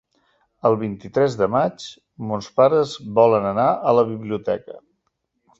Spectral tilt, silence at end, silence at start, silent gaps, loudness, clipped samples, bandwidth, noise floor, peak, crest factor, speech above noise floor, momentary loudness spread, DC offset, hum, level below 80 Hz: -7 dB/octave; 0.8 s; 0.65 s; none; -20 LUFS; under 0.1%; 7.8 kHz; -73 dBFS; -2 dBFS; 18 dB; 54 dB; 12 LU; under 0.1%; none; -58 dBFS